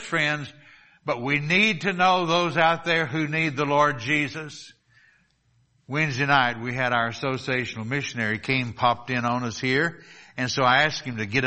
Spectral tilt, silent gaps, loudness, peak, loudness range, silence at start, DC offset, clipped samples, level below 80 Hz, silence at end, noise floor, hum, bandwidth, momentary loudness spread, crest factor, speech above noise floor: -4.5 dB/octave; none; -23 LUFS; -4 dBFS; 4 LU; 0 s; under 0.1%; under 0.1%; -60 dBFS; 0 s; -65 dBFS; none; 8.4 kHz; 10 LU; 20 dB; 41 dB